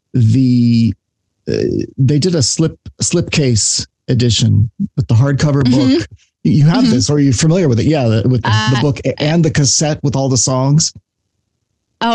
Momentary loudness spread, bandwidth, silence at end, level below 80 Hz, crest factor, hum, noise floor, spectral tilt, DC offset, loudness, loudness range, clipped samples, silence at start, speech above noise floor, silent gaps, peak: 7 LU; 10.5 kHz; 0 s; -40 dBFS; 10 dB; none; -70 dBFS; -5 dB/octave; under 0.1%; -13 LUFS; 2 LU; under 0.1%; 0.15 s; 58 dB; none; -4 dBFS